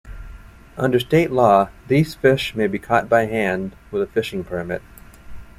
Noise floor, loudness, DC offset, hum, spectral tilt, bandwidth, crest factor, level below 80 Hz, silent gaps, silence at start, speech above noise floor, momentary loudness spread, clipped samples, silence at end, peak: -40 dBFS; -19 LUFS; under 0.1%; none; -6.5 dB/octave; 15.5 kHz; 18 dB; -44 dBFS; none; 0.05 s; 21 dB; 13 LU; under 0.1%; 0.15 s; -2 dBFS